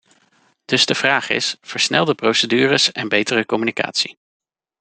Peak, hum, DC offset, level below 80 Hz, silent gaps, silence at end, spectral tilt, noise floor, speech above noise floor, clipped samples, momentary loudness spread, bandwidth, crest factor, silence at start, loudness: 0 dBFS; none; under 0.1%; -62 dBFS; none; 0.7 s; -3 dB/octave; -59 dBFS; 41 dB; under 0.1%; 6 LU; 9.4 kHz; 20 dB; 0.7 s; -17 LUFS